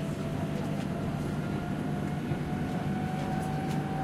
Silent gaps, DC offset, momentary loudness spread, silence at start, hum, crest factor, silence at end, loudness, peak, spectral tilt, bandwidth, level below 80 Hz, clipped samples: none; under 0.1%; 1 LU; 0 s; none; 12 dB; 0 s; -33 LUFS; -20 dBFS; -7 dB/octave; 14.5 kHz; -50 dBFS; under 0.1%